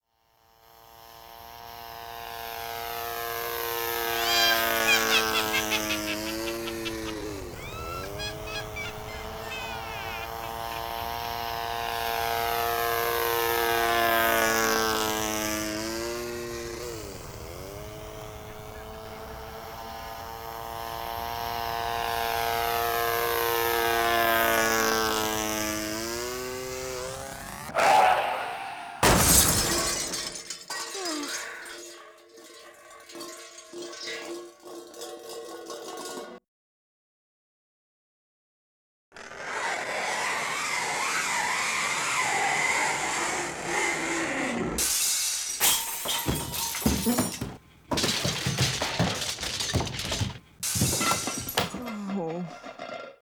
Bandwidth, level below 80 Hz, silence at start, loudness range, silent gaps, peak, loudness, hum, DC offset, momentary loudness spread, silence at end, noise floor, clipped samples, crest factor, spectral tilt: over 20 kHz; -48 dBFS; 0.75 s; 15 LU; 36.48-39.12 s; -6 dBFS; -27 LUFS; none; under 0.1%; 18 LU; 0.1 s; -66 dBFS; under 0.1%; 24 dB; -2.5 dB/octave